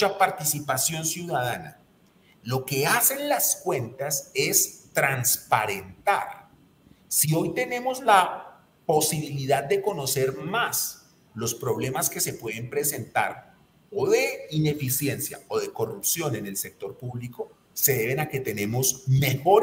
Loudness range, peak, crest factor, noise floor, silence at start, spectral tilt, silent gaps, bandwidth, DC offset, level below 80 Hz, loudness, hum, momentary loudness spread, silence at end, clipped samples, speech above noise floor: 4 LU; -4 dBFS; 22 dB; -59 dBFS; 0 s; -3.5 dB/octave; none; 16.5 kHz; under 0.1%; -62 dBFS; -25 LUFS; none; 13 LU; 0 s; under 0.1%; 33 dB